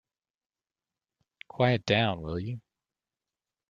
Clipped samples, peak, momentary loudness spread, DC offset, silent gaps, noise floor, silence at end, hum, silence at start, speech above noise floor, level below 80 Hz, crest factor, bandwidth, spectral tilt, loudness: under 0.1%; -8 dBFS; 17 LU; under 0.1%; none; under -90 dBFS; 1.1 s; none; 1.55 s; over 63 dB; -60 dBFS; 24 dB; 7.4 kHz; -6.5 dB/octave; -28 LUFS